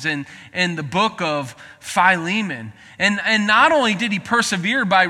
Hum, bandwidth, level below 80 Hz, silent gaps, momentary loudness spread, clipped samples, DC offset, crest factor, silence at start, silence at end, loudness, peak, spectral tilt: none; 14.5 kHz; -58 dBFS; none; 14 LU; under 0.1%; under 0.1%; 18 dB; 0 s; 0 s; -18 LUFS; -2 dBFS; -3.5 dB/octave